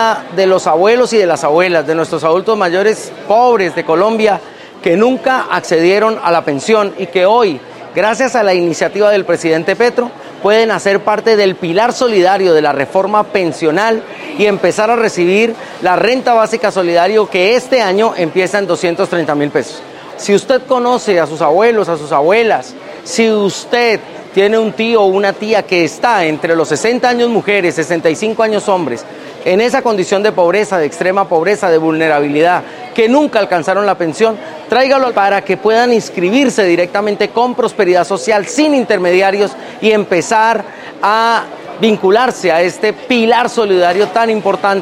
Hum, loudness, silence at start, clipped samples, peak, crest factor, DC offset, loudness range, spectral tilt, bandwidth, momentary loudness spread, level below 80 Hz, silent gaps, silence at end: none; -12 LUFS; 0 s; 0.3%; 0 dBFS; 12 dB; under 0.1%; 2 LU; -4.5 dB/octave; 14 kHz; 5 LU; -58 dBFS; none; 0 s